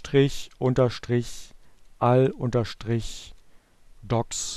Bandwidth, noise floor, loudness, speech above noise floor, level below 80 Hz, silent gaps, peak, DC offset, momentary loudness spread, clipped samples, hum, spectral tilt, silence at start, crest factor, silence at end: 13 kHz; -52 dBFS; -25 LUFS; 28 dB; -44 dBFS; none; -8 dBFS; under 0.1%; 15 LU; under 0.1%; none; -6 dB/octave; 0 s; 18 dB; 0 s